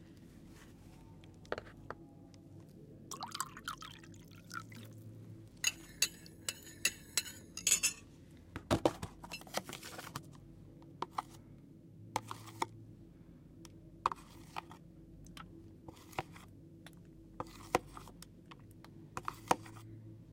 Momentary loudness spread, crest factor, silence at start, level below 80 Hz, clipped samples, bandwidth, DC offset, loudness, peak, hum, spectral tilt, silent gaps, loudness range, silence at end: 21 LU; 32 dB; 0 s; -64 dBFS; under 0.1%; 16.5 kHz; under 0.1%; -39 LUFS; -12 dBFS; none; -2.5 dB/octave; none; 12 LU; 0 s